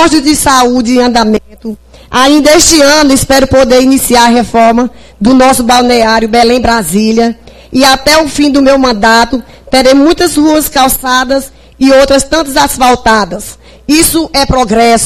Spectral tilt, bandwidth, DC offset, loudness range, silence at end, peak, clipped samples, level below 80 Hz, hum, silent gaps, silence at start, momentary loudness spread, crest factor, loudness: -3 dB/octave; 16 kHz; under 0.1%; 2 LU; 0 s; 0 dBFS; 2%; -28 dBFS; none; none; 0 s; 9 LU; 6 dB; -6 LUFS